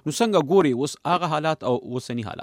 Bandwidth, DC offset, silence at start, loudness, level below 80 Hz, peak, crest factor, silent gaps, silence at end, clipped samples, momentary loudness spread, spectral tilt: 16 kHz; under 0.1%; 0.05 s; -23 LUFS; -64 dBFS; -8 dBFS; 16 dB; none; 0 s; under 0.1%; 11 LU; -5.5 dB/octave